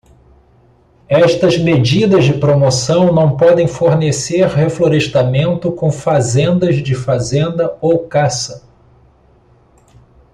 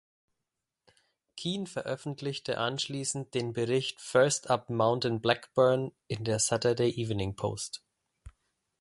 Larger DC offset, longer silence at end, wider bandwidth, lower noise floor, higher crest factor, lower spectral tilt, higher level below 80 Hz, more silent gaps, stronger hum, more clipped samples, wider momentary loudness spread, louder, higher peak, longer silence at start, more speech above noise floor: neither; first, 1.75 s vs 0.5 s; about the same, 11 kHz vs 11.5 kHz; second, -49 dBFS vs -87 dBFS; second, 12 dB vs 22 dB; first, -6 dB/octave vs -4 dB/octave; first, -44 dBFS vs -60 dBFS; neither; neither; neither; second, 6 LU vs 10 LU; first, -13 LUFS vs -30 LUFS; first, -2 dBFS vs -8 dBFS; second, 1.1 s vs 1.35 s; second, 37 dB vs 57 dB